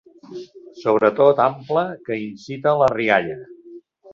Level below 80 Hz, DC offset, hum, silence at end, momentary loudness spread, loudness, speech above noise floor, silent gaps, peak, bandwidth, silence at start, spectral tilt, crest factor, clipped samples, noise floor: -60 dBFS; under 0.1%; none; 0.35 s; 21 LU; -19 LUFS; 24 dB; none; -2 dBFS; 7.4 kHz; 0.3 s; -7 dB/octave; 18 dB; under 0.1%; -44 dBFS